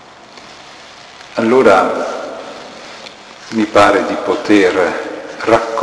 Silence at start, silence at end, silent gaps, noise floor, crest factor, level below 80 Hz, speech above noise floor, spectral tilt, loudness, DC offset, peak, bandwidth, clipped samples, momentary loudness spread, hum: 0.35 s; 0 s; none; -37 dBFS; 14 dB; -50 dBFS; 25 dB; -4.5 dB/octave; -13 LUFS; under 0.1%; 0 dBFS; 11 kHz; under 0.1%; 24 LU; none